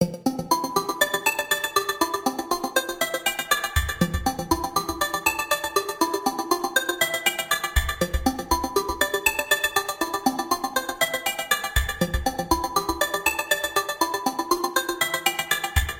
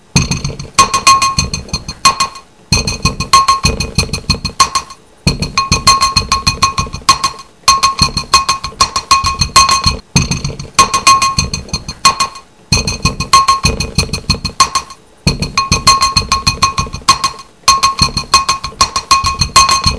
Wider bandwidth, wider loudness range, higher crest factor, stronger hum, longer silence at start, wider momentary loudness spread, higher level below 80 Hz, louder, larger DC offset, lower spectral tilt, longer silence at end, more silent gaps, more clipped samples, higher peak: first, 17 kHz vs 11 kHz; about the same, 1 LU vs 2 LU; first, 22 dB vs 12 dB; neither; second, 0 s vs 0.15 s; second, 4 LU vs 9 LU; second, -36 dBFS vs -26 dBFS; second, -24 LUFS vs -11 LUFS; second, under 0.1% vs 0.6%; about the same, -3 dB/octave vs -2 dB/octave; about the same, 0 s vs 0 s; neither; second, under 0.1% vs 0.3%; about the same, -2 dBFS vs 0 dBFS